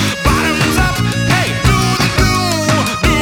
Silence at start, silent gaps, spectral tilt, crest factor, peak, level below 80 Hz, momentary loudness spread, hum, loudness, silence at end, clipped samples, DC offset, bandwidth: 0 s; none; -4.5 dB/octave; 14 dB; 0 dBFS; -22 dBFS; 1 LU; none; -13 LUFS; 0 s; under 0.1%; under 0.1%; 20 kHz